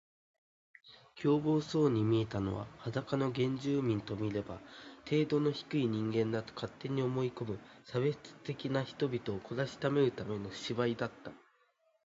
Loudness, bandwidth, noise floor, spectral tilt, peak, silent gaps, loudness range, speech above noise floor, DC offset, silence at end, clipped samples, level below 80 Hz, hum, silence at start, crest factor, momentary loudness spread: -35 LUFS; 7.8 kHz; -73 dBFS; -7 dB/octave; -18 dBFS; none; 3 LU; 39 dB; under 0.1%; 0.7 s; under 0.1%; -64 dBFS; none; 0.85 s; 18 dB; 12 LU